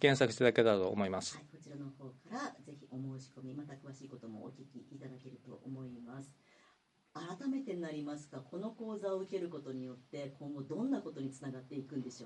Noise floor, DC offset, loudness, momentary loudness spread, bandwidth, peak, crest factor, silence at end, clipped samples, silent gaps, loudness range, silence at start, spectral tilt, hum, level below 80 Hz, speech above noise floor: -72 dBFS; under 0.1%; -39 LUFS; 21 LU; 11 kHz; -12 dBFS; 26 dB; 0 s; under 0.1%; none; 13 LU; 0 s; -5.5 dB/octave; none; -80 dBFS; 34 dB